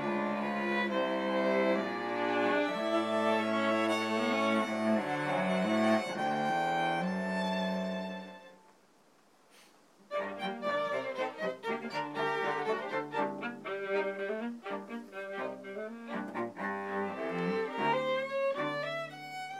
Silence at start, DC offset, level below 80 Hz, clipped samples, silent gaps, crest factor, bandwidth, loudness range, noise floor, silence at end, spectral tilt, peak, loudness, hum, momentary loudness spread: 0 s; under 0.1%; -90 dBFS; under 0.1%; none; 16 dB; 15 kHz; 8 LU; -65 dBFS; 0 s; -5.5 dB/octave; -16 dBFS; -33 LUFS; none; 10 LU